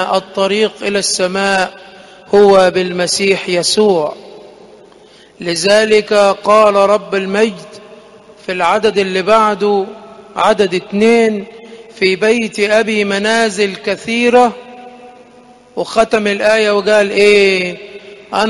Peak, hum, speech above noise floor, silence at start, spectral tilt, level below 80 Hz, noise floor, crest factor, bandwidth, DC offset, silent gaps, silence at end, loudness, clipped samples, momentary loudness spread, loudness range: 0 dBFS; none; 30 dB; 0 s; -3.5 dB/octave; -52 dBFS; -42 dBFS; 14 dB; 11.5 kHz; under 0.1%; none; 0 s; -12 LUFS; under 0.1%; 12 LU; 2 LU